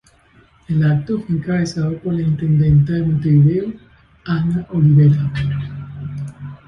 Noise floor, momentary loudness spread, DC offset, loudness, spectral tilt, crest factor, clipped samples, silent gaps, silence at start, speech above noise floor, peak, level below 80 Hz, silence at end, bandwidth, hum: -51 dBFS; 16 LU; under 0.1%; -17 LUFS; -9 dB/octave; 14 dB; under 0.1%; none; 0.7 s; 36 dB; -4 dBFS; -40 dBFS; 0.1 s; 6.8 kHz; none